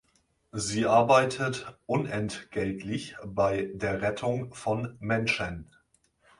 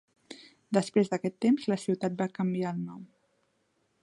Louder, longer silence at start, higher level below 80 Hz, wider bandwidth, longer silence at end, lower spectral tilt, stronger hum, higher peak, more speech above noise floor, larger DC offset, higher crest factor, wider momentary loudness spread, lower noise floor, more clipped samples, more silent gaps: about the same, -28 LUFS vs -30 LUFS; first, 0.55 s vs 0.3 s; first, -56 dBFS vs -76 dBFS; about the same, 11.5 kHz vs 11.5 kHz; second, 0.75 s vs 0.95 s; second, -5 dB/octave vs -6.5 dB/octave; neither; first, -8 dBFS vs -12 dBFS; about the same, 42 dB vs 45 dB; neither; about the same, 20 dB vs 20 dB; second, 13 LU vs 22 LU; second, -70 dBFS vs -74 dBFS; neither; neither